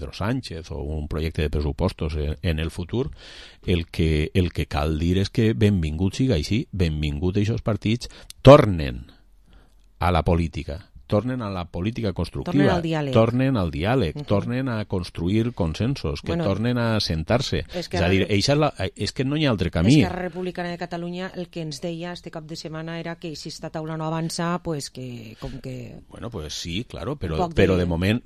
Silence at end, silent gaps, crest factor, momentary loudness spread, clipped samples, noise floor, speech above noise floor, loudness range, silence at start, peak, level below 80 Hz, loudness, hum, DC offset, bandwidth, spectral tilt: 0.05 s; none; 22 dB; 14 LU; under 0.1%; -53 dBFS; 30 dB; 10 LU; 0 s; 0 dBFS; -34 dBFS; -23 LUFS; none; 0.1%; 13 kHz; -6.5 dB/octave